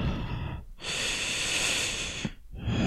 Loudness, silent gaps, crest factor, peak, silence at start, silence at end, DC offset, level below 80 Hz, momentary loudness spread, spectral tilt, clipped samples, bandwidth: -30 LUFS; none; 16 dB; -16 dBFS; 0 s; 0 s; under 0.1%; -42 dBFS; 12 LU; -2.5 dB/octave; under 0.1%; 15.5 kHz